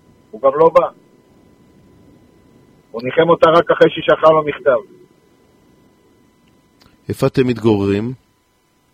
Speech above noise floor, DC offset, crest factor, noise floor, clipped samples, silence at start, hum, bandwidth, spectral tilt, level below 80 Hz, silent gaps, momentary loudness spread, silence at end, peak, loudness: 46 dB; under 0.1%; 18 dB; -59 dBFS; under 0.1%; 0.35 s; none; 14.5 kHz; -7 dB/octave; -52 dBFS; none; 16 LU; 0.8 s; 0 dBFS; -14 LUFS